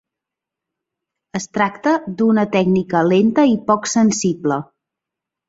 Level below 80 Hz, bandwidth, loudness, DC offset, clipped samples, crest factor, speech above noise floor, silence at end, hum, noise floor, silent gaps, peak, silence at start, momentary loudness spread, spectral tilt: -58 dBFS; 8 kHz; -17 LUFS; under 0.1%; under 0.1%; 16 dB; 69 dB; 0.85 s; none; -85 dBFS; none; -2 dBFS; 1.35 s; 9 LU; -5.5 dB/octave